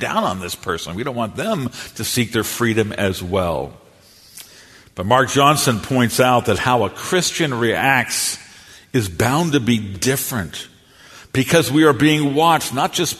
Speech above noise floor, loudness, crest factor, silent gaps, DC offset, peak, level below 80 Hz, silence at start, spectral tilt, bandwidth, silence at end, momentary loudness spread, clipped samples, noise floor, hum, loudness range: 30 dB; -18 LUFS; 18 dB; none; under 0.1%; 0 dBFS; -48 dBFS; 0 s; -4 dB/octave; 14 kHz; 0 s; 12 LU; under 0.1%; -48 dBFS; none; 5 LU